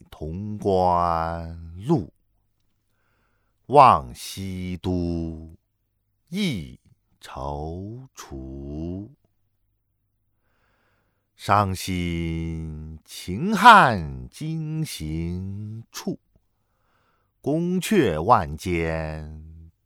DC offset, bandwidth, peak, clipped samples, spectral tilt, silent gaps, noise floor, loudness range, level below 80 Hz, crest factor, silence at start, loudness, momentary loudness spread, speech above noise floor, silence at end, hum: under 0.1%; 18 kHz; 0 dBFS; under 0.1%; -5.5 dB/octave; none; -73 dBFS; 16 LU; -44 dBFS; 24 dB; 0.1 s; -22 LUFS; 22 LU; 50 dB; 0.2 s; none